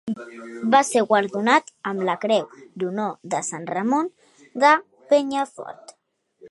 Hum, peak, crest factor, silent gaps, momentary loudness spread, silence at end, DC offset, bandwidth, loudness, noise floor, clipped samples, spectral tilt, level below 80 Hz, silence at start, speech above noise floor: none; -2 dBFS; 22 dB; none; 15 LU; 0.05 s; under 0.1%; 11.5 kHz; -22 LUFS; -67 dBFS; under 0.1%; -4 dB/octave; -76 dBFS; 0.05 s; 45 dB